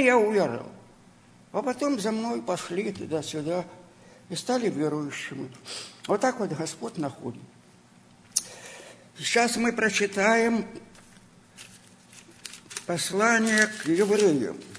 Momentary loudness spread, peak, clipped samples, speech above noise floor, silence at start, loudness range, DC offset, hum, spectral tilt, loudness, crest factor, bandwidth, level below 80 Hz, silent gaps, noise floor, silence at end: 21 LU; -4 dBFS; under 0.1%; 29 dB; 0 s; 5 LU; under 0.1%; none; -3.5 dB/octave; -26 LUFS; 24 dB; 11 kHz; -66 dBFS; none; -55 dBFS; 0 s